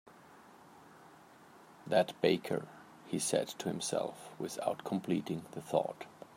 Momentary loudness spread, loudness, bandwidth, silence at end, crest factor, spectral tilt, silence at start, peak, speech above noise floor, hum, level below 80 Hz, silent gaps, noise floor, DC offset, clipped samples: 12 LU; -36 LUFS; 16 kHz; 0.1 s; 22 dB; -4.5 dB/octave; 0.05 s; -14 dBFS; 23 dB; none; -80 dBFS; none; -58 dBFS; under 0.1%; under 0.1%